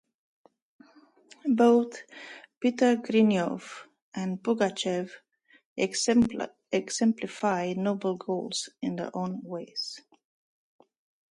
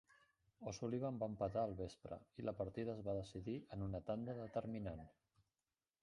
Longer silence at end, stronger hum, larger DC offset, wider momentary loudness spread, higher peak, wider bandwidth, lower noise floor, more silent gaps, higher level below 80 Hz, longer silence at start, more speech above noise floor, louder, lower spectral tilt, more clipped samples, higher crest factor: first, 1.35 s vs 0.9 s; neither; neither; first, 18 LU vs 10 LU; first, -10 dBFS vs -28 dBFS; about the same, 11.5 kHz vs 11 kHz; second, -58 dBFS vs under -90 dBFS; first, 2.57-2.61 s, 4.02-4.12 s, 5.65-5.76 s vs none; about the same, -68 dBFS vs -66 dBFS; first, 1.45 s vs 0.6 s; second, 31 dB vs over 44 dB; first, -28 LUFS vs -46 LUFS; second, -5 dB/octave vs -7.5 dB/octave; neither; about the same, 18 dB vs 18 dB